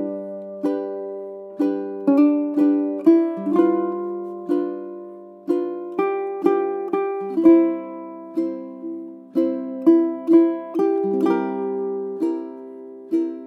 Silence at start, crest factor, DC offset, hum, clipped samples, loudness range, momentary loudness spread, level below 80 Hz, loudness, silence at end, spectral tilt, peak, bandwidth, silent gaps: 0 s; 18 dB; under 0.1%; none; under 0.1%; 4 LU; 16 LU; -74 dBFS; -21 LUFS; 0 s; -9 dB/octave; -4 dBFS; 4.5 kHz; none